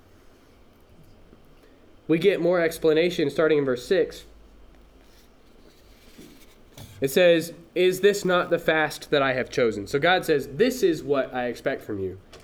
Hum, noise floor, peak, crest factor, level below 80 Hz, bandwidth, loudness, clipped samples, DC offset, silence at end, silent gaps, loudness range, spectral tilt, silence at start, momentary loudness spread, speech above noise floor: none; -54 dBFS; -6 dBFS; 18 dB; -54 dBFS; 19 kHz; -23 LUFS; under 0.1%; under 0.1%; 0.05 s; none; 6 LU; -5 dB/octave; 2.1 s; 10 LU; 31 dB